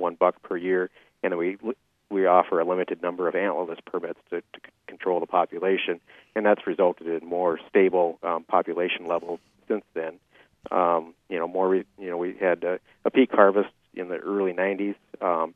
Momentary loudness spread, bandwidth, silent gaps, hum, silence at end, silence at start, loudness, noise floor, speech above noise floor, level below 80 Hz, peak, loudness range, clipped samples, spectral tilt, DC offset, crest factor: 13 LU; 3.8 kHz; none; none; 0.05 s; 0 s; -25 LUFS; -48 dBFS; 23 dB; -74 dBFS; -2 dBFS; 4 LU; under 0.1%; -8 dB/octave; under 0.1%; 24 dB